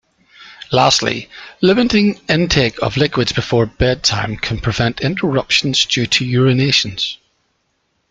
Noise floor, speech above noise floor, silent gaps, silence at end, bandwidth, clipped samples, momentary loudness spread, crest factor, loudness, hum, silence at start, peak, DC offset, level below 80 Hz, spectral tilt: -66 dBFS; 50 dB; none; 0.95 s; 9.2 kHz; under 0.1%; 8 LU; 16 dB; -15 LUFS; none; 0.4 s; 0 dBFS; under 0.1%; -38 dBFS; -4.5 dB/octave